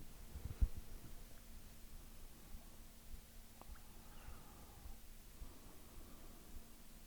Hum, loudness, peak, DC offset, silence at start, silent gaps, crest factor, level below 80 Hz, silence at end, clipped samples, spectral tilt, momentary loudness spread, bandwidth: none; -55 LUFS; -24 dBFS; under 0.1%; 0 s; none; 26 dB; -52 dBFS; 0 s; under 0.1%; -5 dB/octave; 13 LU; over 20 kHz